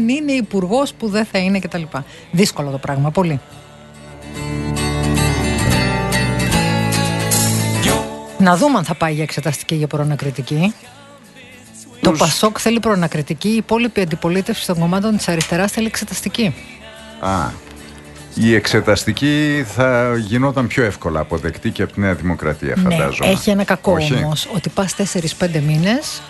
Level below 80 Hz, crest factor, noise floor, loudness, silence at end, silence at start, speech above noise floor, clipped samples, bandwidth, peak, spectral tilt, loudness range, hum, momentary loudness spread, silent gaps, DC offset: -36 dBFS; 18 dB; -41 dBFS; -17 LUFS; 0 s; 0 s; 24 dB; under 0.1%; 12.5 kHz; 0 dBFS; -5 dB/octave; 4 LU; none; 10 LU; none; under 0.1%